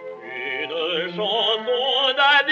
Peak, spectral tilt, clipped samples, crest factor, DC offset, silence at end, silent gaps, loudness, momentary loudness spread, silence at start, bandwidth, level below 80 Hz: -6 dBFS; -3.5 dB/octave; under 0.1%; 16 dB; under 0.1%; 0 s; none; -20 LUFS; 12 LU; 0 s; 7.6 kHz; -86 dBFS